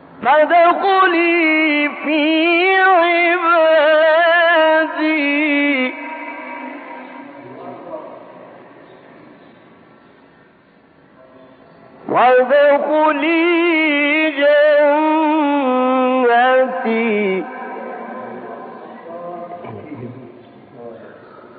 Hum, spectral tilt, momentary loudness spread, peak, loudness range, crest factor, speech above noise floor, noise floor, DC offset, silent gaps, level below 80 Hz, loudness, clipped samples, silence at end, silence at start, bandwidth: none; -1 dB/octave; 21 LU; -2 dBFS; 19 LU; 14 dB; 37 dB; -50 dBFS; under 0.1%; none; -72 dBFS; -13 LUFS; under 0.1%; 0.45 s; 0.2 s; 4.8 kHz